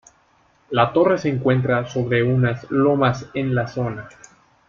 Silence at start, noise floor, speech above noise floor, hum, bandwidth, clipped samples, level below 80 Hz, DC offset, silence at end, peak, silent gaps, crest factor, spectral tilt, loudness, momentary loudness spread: 0.7 s; -59 dBFS; 39 dB; none; 7.4 kHz; under 0.1%; -52 dBFS; under 0.1%; 0.6 s; -4 dBFS; none; 18 dB; -7.5 dB/octave; -20 LUFS; 8 LU